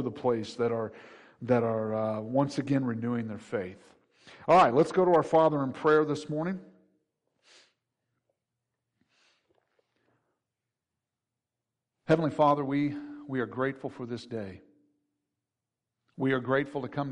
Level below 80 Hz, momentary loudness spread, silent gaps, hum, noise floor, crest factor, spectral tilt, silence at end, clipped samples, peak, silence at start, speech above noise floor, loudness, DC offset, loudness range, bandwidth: -70 dBFS; 16 LU; none; none; -89 dBFS; 18 dB; -7.5 dB/octave; 0 s; under 0.1%; -12 dBFS; 0 s; 61 dB; -28 LUFS; under 0.1%; 11 LU; 10.5 kHz